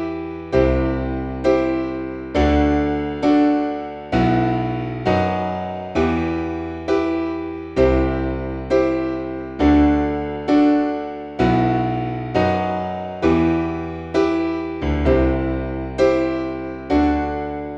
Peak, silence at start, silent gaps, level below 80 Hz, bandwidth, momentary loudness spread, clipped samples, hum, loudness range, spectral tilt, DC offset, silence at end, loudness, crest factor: -4 dBFS; 0 s; none; -30 dBFS; 7.6 kHz; 9 LU; under 0.1%; none; 3 LU; -8 dB/octave; under 0.1%; 0 s; -20 LUFS; 16 dB